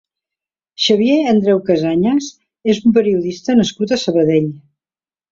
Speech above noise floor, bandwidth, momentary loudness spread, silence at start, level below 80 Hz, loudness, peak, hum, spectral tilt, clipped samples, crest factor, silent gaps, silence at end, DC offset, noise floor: over 76 dB; 7.6 kHz; 6 LU; 0.8 s; -54 dBFS; -15 LUFS; -2 dBFS; none; -5.5 dB/octave; under 0.1%; 14 dB; none; 0.7 s; under 0.1%; under -90 dBFS